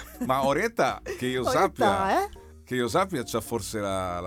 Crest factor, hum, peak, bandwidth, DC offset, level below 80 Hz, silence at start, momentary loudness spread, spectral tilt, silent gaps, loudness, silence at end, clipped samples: 16 dB; none; -10 dBFS; 18.5 kHz; under 0.1%; -50 dBFS; 0 s; 8 LU; -4.5 dB/octave; none; -26 LUFS; 0 s; under 0.1%